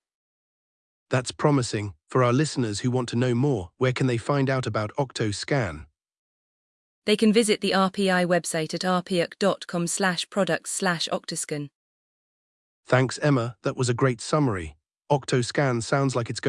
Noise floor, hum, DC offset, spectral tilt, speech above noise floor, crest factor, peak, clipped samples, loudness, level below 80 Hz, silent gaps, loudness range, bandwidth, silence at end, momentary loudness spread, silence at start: under -90 dBFS; none; under 0.1%; -5 dB/octave; over 66 dB; 20 dB; -6 dBFS; under 0.1%; -25 LUFS; -58 dBFS; 6.19-7.02 s, 11.75-12.83 s; 4 LU; 12 kHz; 0 s; 7 LU; 1.1 s